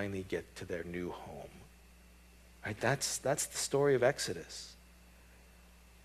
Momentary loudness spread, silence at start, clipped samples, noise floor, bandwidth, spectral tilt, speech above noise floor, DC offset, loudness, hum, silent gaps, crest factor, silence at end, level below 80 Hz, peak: 17 LU; 0 s; under 0.1%; -59 dBFS; 15 kHz; -3.5 dB/octave; 24 dB; under 0.1%; -35 LUFS; none; none; 22 dB; 0.35 s; -60 dBFS; -16 dBFS